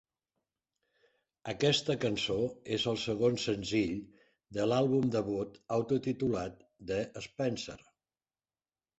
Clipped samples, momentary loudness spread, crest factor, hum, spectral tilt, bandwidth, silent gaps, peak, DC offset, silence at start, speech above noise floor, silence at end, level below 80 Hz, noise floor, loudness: under 0.1%; 13 LU; 20 dB; none; -5.5 dB/octave; 8.2 kHz; none; -14 dBFS; under 0.1%; 1.45 s; over 58 dB; 1.2 s; -62 dBFS; under -90 dBFS; -33 LUFS